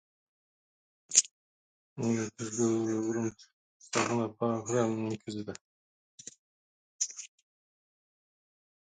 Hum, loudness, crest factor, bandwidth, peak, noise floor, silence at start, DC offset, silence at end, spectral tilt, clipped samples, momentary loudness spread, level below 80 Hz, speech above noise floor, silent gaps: none; -31 LUFS; 30 dB; 9.6 kHz; -6 dBFS; under -90 dBFS; 1.1 s; under 0.1%; 1.6 s; -3.5 dB/octave; under 0.1%; 23 LU; -74 dBFS; over 58 dB; 1.31-1.96 s, 3.53-3.80 s, 5.61-6.18 s, 6.39-6.99 s